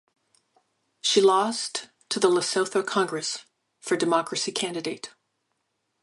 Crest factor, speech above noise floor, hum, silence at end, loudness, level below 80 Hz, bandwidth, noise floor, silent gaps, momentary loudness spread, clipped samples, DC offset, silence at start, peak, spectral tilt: 20 dB; 52 dB; none; 0.95 s; -25 LUFS; -78 dBFS; 11.5 kHz; -77 dBFS; none; 14 LU; under 0.1%; under 0.1%; 1.05 s; -6 dBFS; -2.5 dB/octave